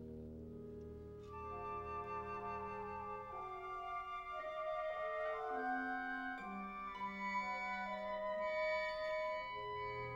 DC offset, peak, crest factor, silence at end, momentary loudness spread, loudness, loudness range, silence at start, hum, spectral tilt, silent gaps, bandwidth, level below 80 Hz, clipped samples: under 0.1%; -30 dBFS; 14 dB; 0 s; 11 LU; -44 LUFS; 5 LU; 0 s; none; -6 dB/octave; none; 16 kHz; -64 dBFS; under 0.1%